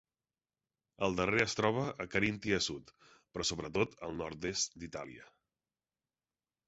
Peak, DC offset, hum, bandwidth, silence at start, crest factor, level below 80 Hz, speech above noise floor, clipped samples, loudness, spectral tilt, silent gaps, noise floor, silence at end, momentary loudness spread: -14 dBFS; under 0.1%; none; 8 kHz; 1 s; 24 dB; -60 dBFS; over 54 dB; under 0.1%; -35 LUFS; -3 dB/octave; none; under -90 dBFS; 1.45 s; 15 LU